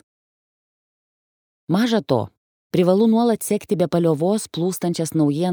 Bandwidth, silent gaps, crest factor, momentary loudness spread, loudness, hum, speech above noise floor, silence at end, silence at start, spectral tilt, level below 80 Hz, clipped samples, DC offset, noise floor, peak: over 20 kHz; 2.37-2.70 s; 18 dB; 7 LU; -20 LUFS; none; over 71 dB; 0 s; 1.7 s; -6 dB/octave; -62 dBFS; under 0.1%; under 0.1%; under -90 dBFS; -4 dBFS